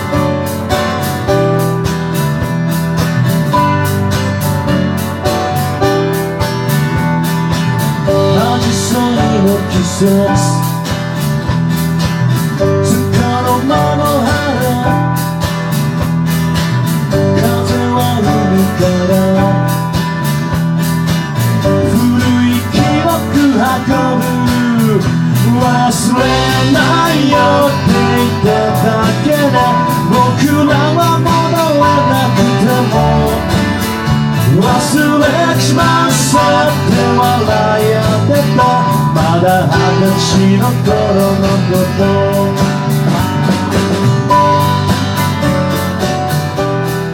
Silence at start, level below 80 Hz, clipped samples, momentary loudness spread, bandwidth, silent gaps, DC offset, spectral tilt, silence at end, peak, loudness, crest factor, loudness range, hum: 0 s; -32 dBFS; under 0.1%; 5 LU; 17.5 kHz; none; under 0.1%; -6 dB/octave; 0 s; 0 dBFS; -12 LUFS; 12 dB; 3 LU; none